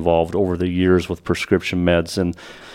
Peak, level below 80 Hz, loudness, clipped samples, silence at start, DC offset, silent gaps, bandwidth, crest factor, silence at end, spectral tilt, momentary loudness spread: -2 dBFS; -40 dBFS; -19 LUFS; under 0.1%; 0 s; under 0.1%; none; 15.5 kHz; 18 dB; 0 s; -6.5 dB/octave; 6 LU